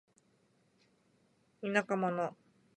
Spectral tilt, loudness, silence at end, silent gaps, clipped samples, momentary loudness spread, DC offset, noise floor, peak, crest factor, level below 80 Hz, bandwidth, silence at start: -6 dB/octave; -35 LUFS; 0.45 s; none; under 0.1%; 9 LU; under 0.1%; -72 dBFS; -14 dBFS; 26 dB; -86 dBFS; 10 kHz; 1.6 s